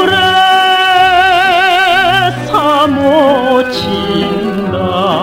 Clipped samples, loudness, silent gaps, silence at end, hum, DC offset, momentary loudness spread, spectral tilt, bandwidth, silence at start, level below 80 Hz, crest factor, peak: under 0.1%; -9 LUFS; none; 0 s; none; under 0.1%; 7 LU; -4.5 dB/octave; 16.5 kHz; 0 s; -42 dBFS; 10 dB; 0 dBFS